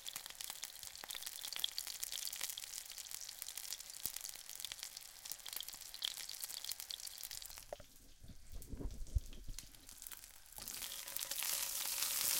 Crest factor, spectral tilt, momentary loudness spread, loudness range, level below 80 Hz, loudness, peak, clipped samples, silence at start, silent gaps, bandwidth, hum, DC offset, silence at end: 32 dB; -0.5 dB/octave; 15 LU; 6 LU; -56 dBFS; -44 LUFS; -12 dBFS; under 0.1%; 0 s; none; 17 kHz; none; under 0.1%; 0 s